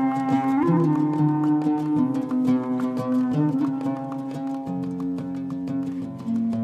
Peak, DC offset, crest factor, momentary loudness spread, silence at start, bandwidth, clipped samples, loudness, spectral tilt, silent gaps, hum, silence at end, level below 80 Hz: -10 dBFS; under 0.1%; 14 dB; 9 LU; 0 s; 9 kHz; under 0.1%; -24 LUFS; -9 dB/octave; none; none; 0 s; -66 dBFS